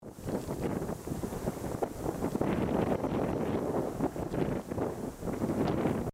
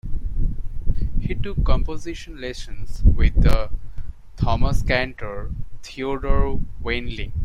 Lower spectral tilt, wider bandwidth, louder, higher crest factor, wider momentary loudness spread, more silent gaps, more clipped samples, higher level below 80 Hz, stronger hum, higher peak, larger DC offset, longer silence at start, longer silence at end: about the same, -7 dB/octave vs -6.5 dB/octave; first, 16 kHz vs 7.4 kHz; second, -34 LUFS vs -25 LUFS; about the same, 16 dB vs 16 dB; second, 7 LU vs 15 LU; neither; neither; second, -50 dBFS vs -22 dBFS; neither; second, -16 dBFS vs -2 dBFS; neither; about the same, 0 s vs 0.05 s; about the same, 0 s vs 0 s